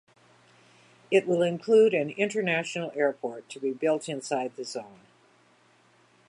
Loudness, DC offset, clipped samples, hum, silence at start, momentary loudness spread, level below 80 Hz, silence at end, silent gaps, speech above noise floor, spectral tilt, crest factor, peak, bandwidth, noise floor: -27 LUFS; under 0.1%; under 0.1%; none; 1.1 s; 16 LU; -82 dBFS; 1.4 s; none; 35 dB; -5 dB/octave; 18 dB; -10 dBFS; 11 kHz; -62 dBFS